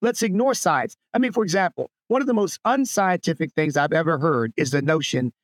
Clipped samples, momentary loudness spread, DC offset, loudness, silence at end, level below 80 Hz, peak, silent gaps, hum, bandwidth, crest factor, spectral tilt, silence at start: under 0.1%; 4 LU; under 0.1%; -22 LUFS; 0.15 s; -72 dBFS; -6 dBFS; none; none; 17.5 kHz; 16 dB; -5 dB/octave; 0 s